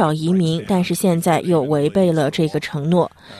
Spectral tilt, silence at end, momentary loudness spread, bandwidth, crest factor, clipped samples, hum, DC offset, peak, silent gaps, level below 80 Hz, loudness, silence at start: -6.5 dB/octave; 0 s; 3 LU; 13.5 kHz; 14 dB; under 0.1%; none; under 0.1%; -4 dBFS; none; -54 dBFS; -18 LUFS; 0 s